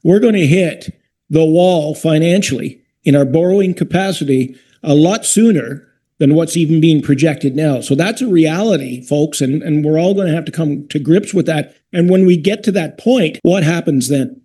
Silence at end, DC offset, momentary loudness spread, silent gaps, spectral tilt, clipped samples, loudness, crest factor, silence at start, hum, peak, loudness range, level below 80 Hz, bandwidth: 0.1 s; under 0.1%; 8 LU; none; -6 dB/octave; under 0.1%; -13 LUFS; 12 dB; 0.05 s; none; 0 dBFS; 2 LU; -54 dBFS; 12.5 kHz